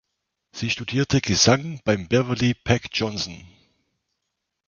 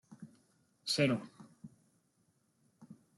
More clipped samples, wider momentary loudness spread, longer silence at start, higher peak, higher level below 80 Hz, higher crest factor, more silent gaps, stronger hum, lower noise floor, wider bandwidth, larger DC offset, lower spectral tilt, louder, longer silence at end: neither; second, 12 LU vs 26 LU; first, 0.55 s vs 0.1 s; first, -2 dBFS vs -16 dBFS; first, -48 dBFS vs -80 dBFS; about the same, 22 dB vs 24 dB; neither; neither; first, -80 dBFS vs -76 dBFS; second, 7.4 kHz vs 12.5 kHz; neither; about the same, -4 dB/octave vs -4.5 dB/octave; first, -22 LUFS vs -34 LUFS; first, 1.2 s vs 0.25 s